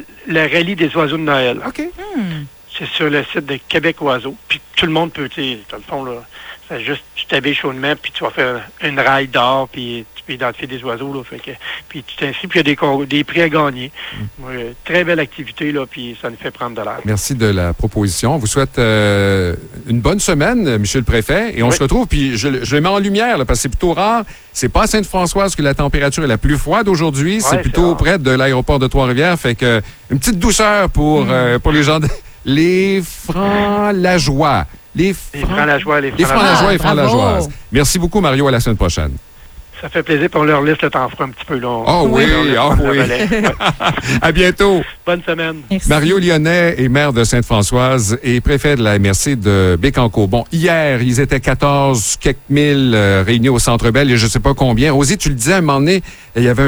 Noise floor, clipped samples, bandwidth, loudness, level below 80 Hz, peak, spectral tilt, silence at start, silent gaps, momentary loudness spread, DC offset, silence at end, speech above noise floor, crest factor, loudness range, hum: -36 dBFS; under 0.1%; over 20 kHz; -14 LUFS; -26 dBFS; 0 dBFS; -5 dB/octave; 0 s; none; 11 LU; under 0.1%; 0 s; 22 dB; 14 dB; 6 LU; none